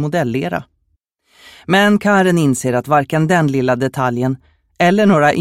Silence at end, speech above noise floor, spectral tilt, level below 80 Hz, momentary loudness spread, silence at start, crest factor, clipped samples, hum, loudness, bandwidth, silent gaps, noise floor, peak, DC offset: 0 s; 51 dB; -6 dB/octave; -52 dBFS; 9 LU; 0 s; 14 dB; under 0.1%; none; -15 LUFS; 16 kHz; none; -65 dBFS; 0 dBFS; under 0.1%